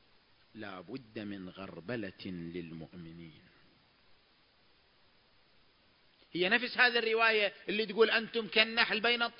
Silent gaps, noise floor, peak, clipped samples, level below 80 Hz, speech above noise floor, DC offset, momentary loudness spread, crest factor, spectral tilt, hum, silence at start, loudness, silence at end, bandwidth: none; -68 dBFS; -10 dBFS; under 0.1%; -72 dBFS; 35 dB; under 0.1%; 20 LU; 26 dB; -7.5 dB/octave; none; 0.55 s; -30 LUFS; 0.1 s; 5.6 kHz